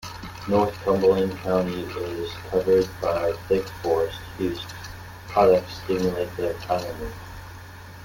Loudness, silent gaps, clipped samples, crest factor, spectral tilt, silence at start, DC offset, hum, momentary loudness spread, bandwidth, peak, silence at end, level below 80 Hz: -24 LUFS; none; under 0.1%; 20 dB; -6 dB/octave; 0 s; under 0.1%; none; 18 LU; 17 kHz; -4 dBFS; 0 s; -46 dBFS